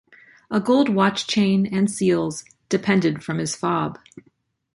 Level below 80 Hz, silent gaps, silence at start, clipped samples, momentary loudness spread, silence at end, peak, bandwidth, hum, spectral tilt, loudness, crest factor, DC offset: -60 dBFS; none; 0.5 s; under 0.1%; 8 LU; 0.55 s; -4 dBFS; 11.5 kHz; none; -5.5 dB/octave; -21 LUFS; 18 dB; under 0.1%